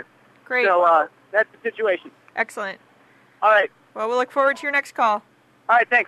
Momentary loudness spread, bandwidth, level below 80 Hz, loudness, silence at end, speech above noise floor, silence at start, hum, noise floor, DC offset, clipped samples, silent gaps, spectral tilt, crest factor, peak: 12 LU; 13 kHz; -78 dBFS; -21 LUFS; 0.05 s; 35 dB; 0.5 s; none; -55 dBFS; under 0.1%; under 0.1%; none; -3 dB/octave; 16 dB; -6 dBFS